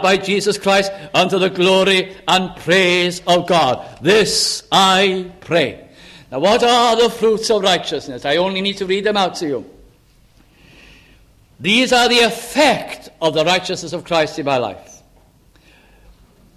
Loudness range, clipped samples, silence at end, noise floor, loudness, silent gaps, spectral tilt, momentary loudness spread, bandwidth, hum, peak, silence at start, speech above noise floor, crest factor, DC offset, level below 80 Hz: 6 LU; under 0.1%; 1.75 s; -51 dBFS; -15 LUFS; none; -3.5 dB/octave; 10 LU; 15.5 kHz; none; 0 dBFS; 0 s; 35 dB; 16 dB; under 0.1%; -50 dBFS